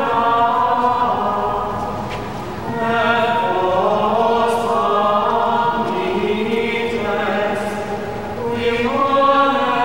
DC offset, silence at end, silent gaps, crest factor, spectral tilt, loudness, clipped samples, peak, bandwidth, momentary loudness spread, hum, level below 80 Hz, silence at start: 1%; 0 s; none; 14 dB; -5.5 dB/octave; -18 LUFS; under 0.1%; -4 dBFS; 16 kHz; 9 LU; none; -44 dBFS; 0 s